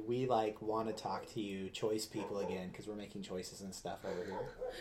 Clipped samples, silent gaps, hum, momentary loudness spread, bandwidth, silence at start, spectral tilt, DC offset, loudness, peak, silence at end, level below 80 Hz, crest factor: under 0.1%; none; none; 11 LU; 16 kHz; 0 s; -5 dB/octave; under 0.1%; -41 LUFS; -20 dBFS; 0 s; -66 dBFS; 20 dB